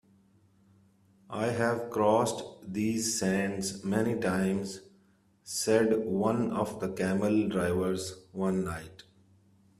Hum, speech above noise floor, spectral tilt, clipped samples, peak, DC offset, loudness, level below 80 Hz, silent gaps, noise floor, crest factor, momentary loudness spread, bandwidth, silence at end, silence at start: none; 36 dB; -5 dB/octave; under 0.1%; -10 dBFS; under 0.1%; -30 LUFS; -64 dBFS; none; -65 dBFS; 20 dB; 12 LU; 14.5 kHz; 0.85 s; 1.3 s